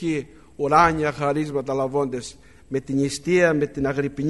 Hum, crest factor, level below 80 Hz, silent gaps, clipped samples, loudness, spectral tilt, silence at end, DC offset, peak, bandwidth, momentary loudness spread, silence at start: none; 20 dB; -48 dBFS; none; under 0.1%; -22 LUFS; -6 dB/octave; 0 s; 0.2%; -2 dBFS; 11.5 kHz; 13 LU; 0 s